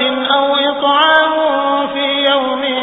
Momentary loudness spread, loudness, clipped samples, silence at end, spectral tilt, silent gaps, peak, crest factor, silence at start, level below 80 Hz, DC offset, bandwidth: 6 LU; -13 LUFS; under 0.1%; 0 s; -5 dB/octave; none; 0 dBFS; 14 dB; 0 s; -54 dBFS; under 0.1%; 4 kHz